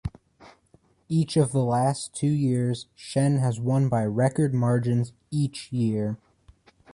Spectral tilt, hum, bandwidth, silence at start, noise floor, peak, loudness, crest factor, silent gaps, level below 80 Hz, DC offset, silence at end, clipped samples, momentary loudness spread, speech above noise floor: -7 dB/octave; none; 11.5 kHz; 0.05 s; -61 dBFS; -10 dBFS; -25 LUFS; 16 dB; none; -52 dBFS; under 0.1%; 0.8 s; under 0.1%; 7 LU; 37 dB